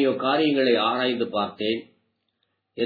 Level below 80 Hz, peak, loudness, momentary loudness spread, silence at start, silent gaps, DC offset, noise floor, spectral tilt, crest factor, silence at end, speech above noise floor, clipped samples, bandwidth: -74 dBFS; -8 dBFS; -23 LUFS; 8 LU; 0 s; none; under 0.1%; -75 dBFS; -7.5 dB/octave; 16 dB; 0 s; 52 dB; under 0.1%; 4.9 kHz